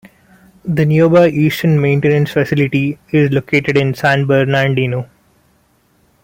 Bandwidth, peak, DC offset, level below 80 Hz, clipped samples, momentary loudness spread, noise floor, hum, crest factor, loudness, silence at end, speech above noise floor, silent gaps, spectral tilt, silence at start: 16.5 kHz; 0 dBFS; under 0.1%; -50 dBFS; under 0.1%; 8 LU; -56 dBFS; none; 14 dB; -13 LUFS; 1.2 s; 43 dB; none; -7.5 dB/octave; 0.65 s